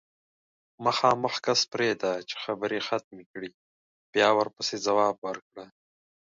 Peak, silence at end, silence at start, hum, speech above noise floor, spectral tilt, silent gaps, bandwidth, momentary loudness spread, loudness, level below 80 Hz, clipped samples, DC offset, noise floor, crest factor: -6 dBFS; 0.65 s; 0.8 s; none; over 63 dB; -3 dB/octave; 3.04-3.11 s, 3.26-3.34 s, 3.54-4.13 s, 5.18-5.22 s, 5.42-5.51 s; 7.8 kHz; 17 LU; -27 LUFS; -74 dBFS; under 0.1%; under 0.1%; under -90 dBFS; 22 dB